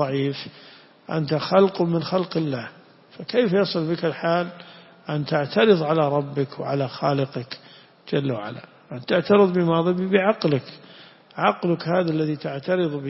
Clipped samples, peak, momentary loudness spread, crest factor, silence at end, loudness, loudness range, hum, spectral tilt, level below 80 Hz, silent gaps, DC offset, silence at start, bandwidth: under 0.1%; -4 dBFS; 18 LU; 20 dB; 0 s; -22 LUFS; 3 LU; none; -10 dB/octave; -66 dBFS; none; under 0.1%; 0 s; 5.8 kHz